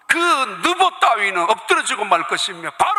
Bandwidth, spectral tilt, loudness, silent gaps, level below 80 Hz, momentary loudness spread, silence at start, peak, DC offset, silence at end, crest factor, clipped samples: 15.5 kHz; -1 dB/octave; -17 LUFS; none; -64 dBFS; 5 LU; 0.1 s; 0 dBFS; under 0.1%; 0 s; 16 dB; under 0.1%